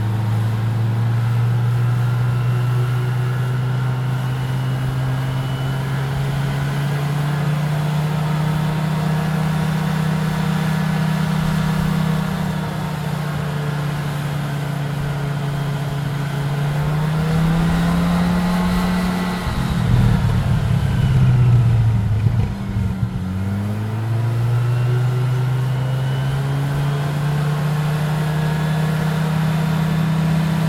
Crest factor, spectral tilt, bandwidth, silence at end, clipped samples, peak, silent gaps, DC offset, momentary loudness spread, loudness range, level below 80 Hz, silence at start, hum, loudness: 16 dB; -7 dB/octave; 16 kHz; 0 s; under 0.1%; -2 dBFS; none; under 0.1%; 5 LU; 4 LU; -34 dBFS; 0 s; none; -20 LUFS